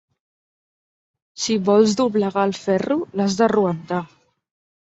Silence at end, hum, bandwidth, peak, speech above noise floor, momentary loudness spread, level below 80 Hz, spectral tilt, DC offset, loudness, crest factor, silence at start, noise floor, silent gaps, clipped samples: 0.8 s; none; 8 kHz; -2 dBFS; over 71 dB; 11 LU; -62 dBFS; -5.5 dB/octave; under 0.1%; -20 LUFS; 18 dB; 1.35 s; under -90 dBFS; none; under 0.1%